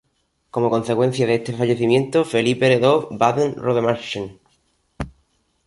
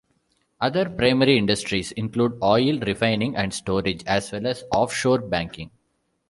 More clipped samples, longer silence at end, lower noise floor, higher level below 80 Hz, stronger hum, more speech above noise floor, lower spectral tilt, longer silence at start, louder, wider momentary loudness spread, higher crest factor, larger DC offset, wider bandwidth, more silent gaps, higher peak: neither; about the same, 0.55 s vs 0.6 s; about the same, -68 dBFS vs -71 dBFS; about the same, -50 dBFS vs -50 dBFS; neither; about the same, 50 dB vs 49 dB; about the same, -6 dB/octave vs -5 dB/octave; about the same, 0.55 s vs 0.6 s; first, -19 LUFS vs -22 LUFS; first, 16 LU vs 9 LU; about the same, 18 dB vs 20 dB; neither; about the same, 11.5 kHz vs 11.5 kHz; neither; about the same, -2 dBFS vs -4 dBFS